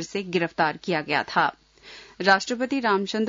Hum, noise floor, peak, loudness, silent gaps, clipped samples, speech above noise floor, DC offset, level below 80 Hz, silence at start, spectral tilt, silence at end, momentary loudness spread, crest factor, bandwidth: none; -47 dBFS; -6 dBFS; -24 LUFS; none; under 0.1%; 23 dB; under 0.1%; -64 dBFS; 0 s; -4.5 dB/octave; 0 s; 7 LU; 20 dB; 7.8 kHz